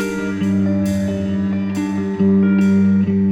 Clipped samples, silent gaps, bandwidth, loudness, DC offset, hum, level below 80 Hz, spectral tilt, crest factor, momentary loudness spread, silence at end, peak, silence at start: under 0.1%; none; 11 kHz; -17 LUFS; under 0.1%; none; -48 dBFS; -8 dB/octave; 10 dB; 7 LU; 0 s; -6 dBFS; 0 s